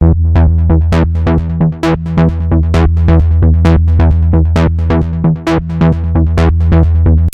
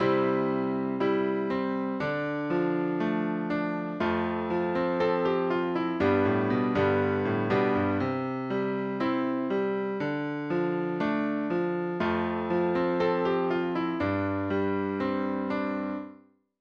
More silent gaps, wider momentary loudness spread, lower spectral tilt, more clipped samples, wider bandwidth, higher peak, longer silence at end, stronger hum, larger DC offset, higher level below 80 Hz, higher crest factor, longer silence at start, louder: neither; about the same, 4 LU vs 5 LU; about the same, -9 dB/octave vs -8.5 dB/octave; neither; about the same, 6.4 kHz vs 6.8 kHz; first, 0 dBFS vs -12 dBFS; second, 0 s vs 0.45 s; neither; neither; first, -14 dBFS vs -62 dBFS; second, 8 dB vs 16 dB; about the same, 0 s vs 0 s; first, -11 LUFS vs -28 LUFS